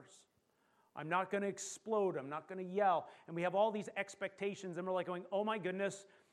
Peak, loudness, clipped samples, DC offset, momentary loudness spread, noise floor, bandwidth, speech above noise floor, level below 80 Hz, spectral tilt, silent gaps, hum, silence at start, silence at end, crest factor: -20 dBFS; -39 LUFS; under 0.1%; under 0.1%; 10 LU; -77 dBFS; 13 kHz; 38 dB; under -90 dBFS; -5 dB/octave; none; none; 0 s; 0.3 s; 18 dB